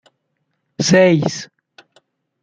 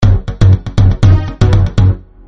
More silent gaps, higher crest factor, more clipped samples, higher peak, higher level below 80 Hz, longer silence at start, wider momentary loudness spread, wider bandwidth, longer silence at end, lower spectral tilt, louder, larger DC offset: neither; first, 18 dB vs 10 dB; neither; about the same, -2 dBFS vs 0 dBFS; second, -58 dBFS vs -16 dBFS; first, 0.8 s vs 0 s; first, 19 LU vs 3 LU; first, 9.2 kHz vs 7.2 kHz; first, 1 s vs 0.3 s; second, -5 dB/octave vs -8 dB/octave; second, -14 LUFS vs -11 LUFS; neither